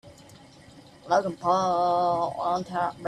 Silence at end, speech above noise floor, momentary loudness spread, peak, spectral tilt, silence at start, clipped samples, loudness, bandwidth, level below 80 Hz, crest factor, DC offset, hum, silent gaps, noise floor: 0 s; 25 dB; 5 LU; -10 dBFS; -5.5 dB/octave; 0.05 s; under 0.1%; -25 LUFS; 12 kHz; -64 dBFS; 16 dB; under 0.1%; none; none; -51 dBFS